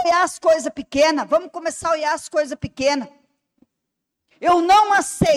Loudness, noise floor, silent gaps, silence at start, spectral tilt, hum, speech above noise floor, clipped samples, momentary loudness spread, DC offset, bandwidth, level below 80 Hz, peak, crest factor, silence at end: -19 LUFS; -80 dBFS; none; 0 s; -4 dB/octave; none; 61 dB; under 0.1%; 11 LU; under 0.1%; 15 kHz; -50 dBFS; -6 dBFS; 14 dB; 0 s